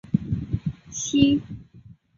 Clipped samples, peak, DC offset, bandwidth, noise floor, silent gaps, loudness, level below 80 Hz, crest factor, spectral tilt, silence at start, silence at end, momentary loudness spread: under 0.1%; -4 dBFS; under 0.1%; 7.6 kHz; -50 dBFS; none; -24 LUFS; -44 dBFS; 22 dB; -5 dB/octave; 0.05 s; 0.25 s; 17 LU